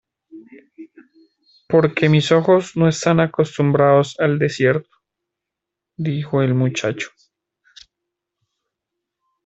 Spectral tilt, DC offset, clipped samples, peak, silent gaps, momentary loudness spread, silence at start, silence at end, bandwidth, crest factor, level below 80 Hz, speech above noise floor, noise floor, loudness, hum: -6.5 dB/octave; under 0.1%; under 0.1%; -2 dBFS; none; 10 LU; 0.35 s; 2.4 s; 8 kHz; 18 dB; -58 dBFS; 66 dB; -84 dBFS; -17 LUFS; none